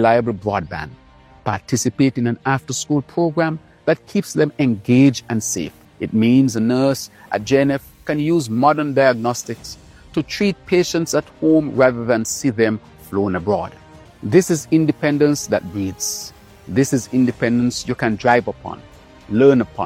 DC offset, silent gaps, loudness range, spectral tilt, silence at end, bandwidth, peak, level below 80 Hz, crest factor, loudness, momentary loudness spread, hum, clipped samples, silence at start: under 0.1%; none; 2 LU; -5.5 dB/octave; 0 s; 16 kHz; 0 dBFS; -50 dBFS; 18 dB; -18 LUFS; 12 LU; none; under 0.1%; 0 s